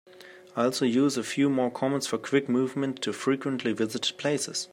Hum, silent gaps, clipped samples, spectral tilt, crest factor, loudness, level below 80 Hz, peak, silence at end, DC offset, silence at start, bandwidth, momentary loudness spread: none; none; under 0.1%; -4.5 dB/octave; 18 dB; -27 LUFS; -76 dBFS; -10 dBFS; 0.05 s; under 0.1%; 0.15 s; 15.5 kHz; 5 LU